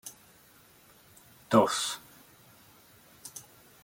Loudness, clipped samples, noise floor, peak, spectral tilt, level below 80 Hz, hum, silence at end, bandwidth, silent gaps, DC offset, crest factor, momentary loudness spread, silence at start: -28 LUFS; under 0.1%; -59 dBFS; -8 dBFS; -4 dB/octave; -72 dBFS; none; 0.45 s; 17 kHz; none; under 0.1%; 28 dB; 23 LU; 0.05 s